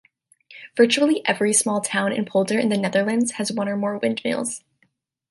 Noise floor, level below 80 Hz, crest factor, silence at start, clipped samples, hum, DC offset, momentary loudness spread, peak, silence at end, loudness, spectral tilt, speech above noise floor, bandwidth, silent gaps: -67 dBFS; -70 dBFS; 20 dB; 0.5 s; under 0.1%; none; under 0.1%; 8 LU; -2 dBFS; 0.7 s; -21 LUFS; -3.5 dB/octave; 46 dB; 12 kHz; none